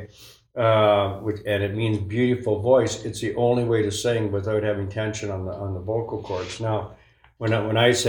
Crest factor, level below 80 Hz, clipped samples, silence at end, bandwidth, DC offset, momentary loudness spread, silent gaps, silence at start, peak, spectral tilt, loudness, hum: 18 dB; -54 dBFS; under 0.1%; 0 s; 18 kHz; under 0.1%; 11 LU; none; 0 s; -6 dBFS; -5.5 dB/octave; -23 LUFS; none